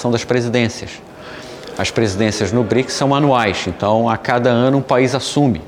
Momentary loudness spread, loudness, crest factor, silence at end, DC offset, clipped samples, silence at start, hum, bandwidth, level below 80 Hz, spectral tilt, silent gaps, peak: 17 LU; -16 LUFS; 14 dB; 0 s; under 0.1%; under 0.1%; 0 s; none; 15 kHz; -48 dBFS; -5.5 dB/octave; none; -2 dBFS